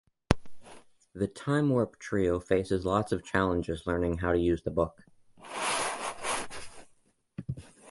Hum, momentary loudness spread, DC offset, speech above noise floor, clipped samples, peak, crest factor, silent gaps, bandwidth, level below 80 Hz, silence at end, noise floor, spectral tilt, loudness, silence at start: none; 14 LU; under 0.1%; 37 dB; under 0.1%; -2 dBFS; 28 dB; none; 11.5 kHz; -48 dBFS; 0 s; -66 dBFS; -5.5 dB/octave; -30 LUFS; 0.3 s